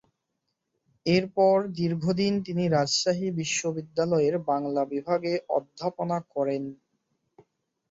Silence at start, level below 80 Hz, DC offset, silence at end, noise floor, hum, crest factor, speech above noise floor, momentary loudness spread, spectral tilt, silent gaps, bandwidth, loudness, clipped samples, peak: 1.05 s; -66 dBFS; under 0.1%; 1.15 s; -80 dBFS; none; 18 dB; 54 dB; 8 LU; -5 dB/octave; none; 8 kHz; -27 LUFS; under 0.1%; -10 dBFS